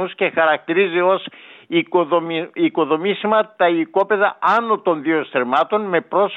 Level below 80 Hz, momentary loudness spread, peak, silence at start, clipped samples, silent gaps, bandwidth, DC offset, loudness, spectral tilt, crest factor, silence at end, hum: -76 dBFS; 4 LU; -4 dBFS; 0 s; under 0.1%; none; 6.2 kHz; under 0.1%; -18 LUFS; -7 dB/octave; 14 dB; 0 s; none